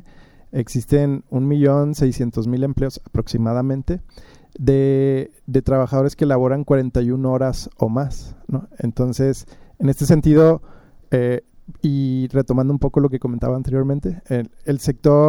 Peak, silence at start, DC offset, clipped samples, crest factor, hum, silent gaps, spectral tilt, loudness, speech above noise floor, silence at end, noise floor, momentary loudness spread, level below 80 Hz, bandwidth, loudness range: -2 dBFS; 0.55 s; under 0.1%; under 0.1%; 16 dB; none; none; -8.5 dB/octave; -19 LUFS; 27 dB; 0 s; -45 dBFS; 9 LU; -36 dBFS; 16.5 kHz; 3 LU